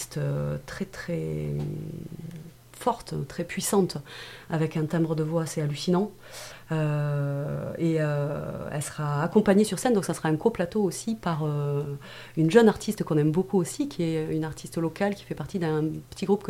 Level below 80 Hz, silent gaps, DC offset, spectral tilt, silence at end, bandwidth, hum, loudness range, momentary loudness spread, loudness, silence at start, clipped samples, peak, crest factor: -54 dBFS; none; under 0.1%; -6 dB/octave; 0 s; 16 kHz; none; 5 LU; 13 LU; -27 LUFS; 0 s; under 0.1%; -4 dBFS; 22 dB